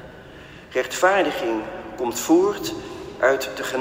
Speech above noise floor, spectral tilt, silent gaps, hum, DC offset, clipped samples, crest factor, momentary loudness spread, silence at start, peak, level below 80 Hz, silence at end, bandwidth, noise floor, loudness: 21 dB; -3.5 dB/octave; none; none; under 0.1%; under 0.1%; 18 dB; 21 LU; 0 s; -4 dBFS; -54 dBFS; 0 s; 16 kHz; -42 dBFS; -22 LUFS